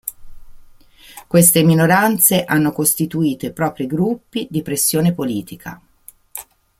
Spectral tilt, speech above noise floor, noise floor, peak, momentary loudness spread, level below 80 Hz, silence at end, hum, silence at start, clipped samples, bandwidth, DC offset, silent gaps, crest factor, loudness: -4.5 dB/octave; 28 dB; -44 dBFS; 0 dBFS; 21 LU; -50 dBFS; 0.4 s; none; 0.05 s; under 0.1%; 16.5 kHz; under 0.1%; none; 18 dB; -16 LUFS